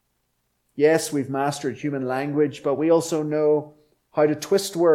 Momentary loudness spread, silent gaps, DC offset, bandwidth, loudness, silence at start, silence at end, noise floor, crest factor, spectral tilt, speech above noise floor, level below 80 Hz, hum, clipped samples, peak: 7 LU; none; under 0.1%; 16.5 kHz; -23 LUFS; 0.75 s; 0 s; -72 dBFS; 16 dB; -5.5 dB/octave; 51 dB; -68 dBFS; none; under 0.1%; -6 dBFS